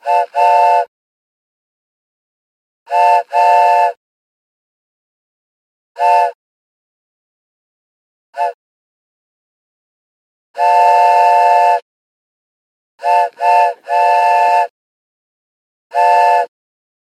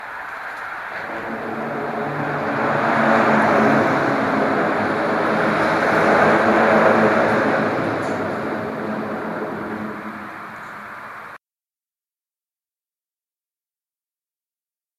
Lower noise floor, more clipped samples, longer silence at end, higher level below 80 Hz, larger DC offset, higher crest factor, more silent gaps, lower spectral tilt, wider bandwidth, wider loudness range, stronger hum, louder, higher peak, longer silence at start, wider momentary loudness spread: about the same, under -90 dBFS vs under -90 dBFS; neither; second, 0.55 s vs 3.6 s; second, -88 dBFS vs -56 dBFS; neither; about the same, 16 dB vs 18 dB; first, 0.88-2.86 s, 3.97-5.95 s, 6.35-8.33 s, 8.54-10.54 s, 11.82-12.98 s, 14.70-15.90 s vs none; second, 1 dB/octave vs -6.5 dB/octave; about the same, 13.5 kHz vs 14 kHz; second, 12 LU vs 17 LU; neither; first, -12 LUFS vs -19 LUFS; about the same, 0 dBFS vs -2 dBFS; about the same, 0.05 s vs 0 s; second, 12 LU vs 17 LU